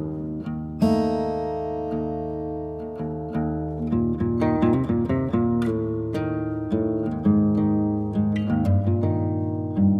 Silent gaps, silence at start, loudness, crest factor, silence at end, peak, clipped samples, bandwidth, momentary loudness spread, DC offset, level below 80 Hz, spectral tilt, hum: none; 0 s; -24 LUFS; 14 dB; 0 s; -10 dBFS; under 0.1%; 9.2 kHz; 9 LU; under 0.1%; -42 dBFS; -10 dB/octave; none